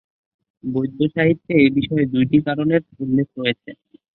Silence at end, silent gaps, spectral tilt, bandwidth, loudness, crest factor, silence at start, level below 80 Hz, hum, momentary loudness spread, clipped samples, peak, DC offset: 0.4 s; none; -11.5 dB/octave; 4.3 kHz; -19 LUFS; 16 dB; 0.65 s; -54 dBFS; none; 8 LU; under 0.1%; -2 dBFS; under 0.1%